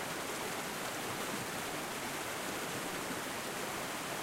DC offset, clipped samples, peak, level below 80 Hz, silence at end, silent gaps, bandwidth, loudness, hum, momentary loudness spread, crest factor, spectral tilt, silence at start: under 0.1%; under 0.1%; -26 dBFS; -68 dBFS; 0 s; none; 16 kHz; -38 LUFS; none; 1 LU; 14 dB; -2.5 dB/octave; 0 s